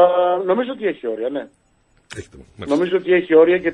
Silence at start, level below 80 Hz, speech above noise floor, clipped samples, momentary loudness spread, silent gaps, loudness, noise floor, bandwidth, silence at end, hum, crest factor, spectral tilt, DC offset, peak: 0 s; -56 dBFS; 41 dB; under 0.1%; 22 LU; none; -18 LUFS; -59 dBFS; 10 kHz; 0 s; none; 16 dB; -6.5 dB/octave; under 0.1%; -2 dBFS